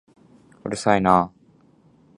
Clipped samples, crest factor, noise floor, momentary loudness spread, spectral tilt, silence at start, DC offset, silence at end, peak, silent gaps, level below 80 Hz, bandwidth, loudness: under 0.1%; 22 dB; -56 dBFS; 15 LU; -6 dB/octave; 0.65 s; under 0.1%; 0.9 s; -2 dBFS; none; -52 dBFS; 11 kHz; -21 LUFS